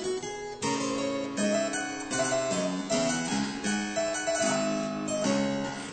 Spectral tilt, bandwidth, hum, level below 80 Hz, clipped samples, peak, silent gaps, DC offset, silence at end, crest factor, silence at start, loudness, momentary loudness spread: -3.5 dB/octave; 9.2 kHz; none; -60 dBFS; under 0.1%; -16 dBFS; none; under 0.1%; 0 s; 14 dB; 0 s; -29 LUFS; 5 LU